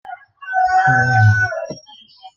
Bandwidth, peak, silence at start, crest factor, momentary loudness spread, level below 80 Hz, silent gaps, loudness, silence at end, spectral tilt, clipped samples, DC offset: 7.2 kHz; -2 dBFS; 0.05 s; 14 dB; 21 LU; -50 dBFS; none; -15 LUFS; 0.1 s; -6 dB/octave; under 0.1%; under 0.1%